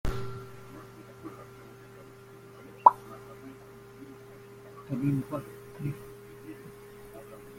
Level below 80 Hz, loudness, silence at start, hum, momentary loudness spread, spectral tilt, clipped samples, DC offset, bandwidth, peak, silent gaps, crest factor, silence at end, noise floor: -50 dBFS; -29 LUFS; 0.05 s; none; 23 LU; -7.5 dB/octave; under 0.1%; under 0.1%; 16.5 kHz; -2 dBFS; none; 32 dB; 0 s; -50 dBFS